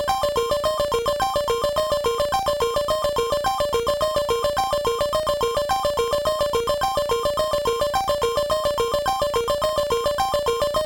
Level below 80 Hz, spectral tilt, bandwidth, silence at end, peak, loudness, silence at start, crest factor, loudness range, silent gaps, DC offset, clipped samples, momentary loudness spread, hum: -42 dBFS; -3 dB/octave; over 20 kHz; 0 s; -8 dBFS; -22 LUFS; 0 s; 14 dB; 0 LU; none; under 0.1%; under 0.1%; 1 LU; none